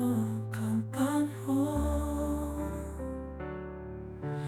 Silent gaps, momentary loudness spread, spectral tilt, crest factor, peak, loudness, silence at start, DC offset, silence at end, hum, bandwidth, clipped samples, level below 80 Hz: none; 10 LU; -7 dB/octave; 14 dB; -18 dBFS; -34 LUFS; 0 s; under 0.1%; 0 s; none; 17.5 kHz; under 0.1%; -42 dBFS